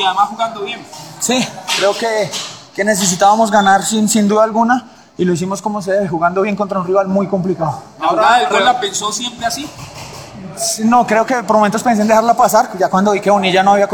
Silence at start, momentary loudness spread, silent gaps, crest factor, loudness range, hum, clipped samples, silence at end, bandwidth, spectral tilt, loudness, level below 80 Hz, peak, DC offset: 0 s; 12 LU; none; 14 dB; 3 LU; none; under 0.1%; 0 s; 19 kHz; -4 dB/octave; -14 LUFS; -52 dBFS; 0 dBFS; 0.1%